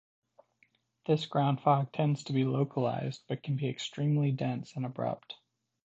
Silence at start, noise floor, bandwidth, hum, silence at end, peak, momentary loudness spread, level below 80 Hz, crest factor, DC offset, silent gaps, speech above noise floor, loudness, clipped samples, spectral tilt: 1.1 s; -71 dBFS; 7.8 kHz; none; 0.5 s; -12 dBFS; 10 LU; -74 dBFS; 20 dB; under 0.1%; none; 40 dB; -32 LUFS; under 0.1%; -7.5 dB/octave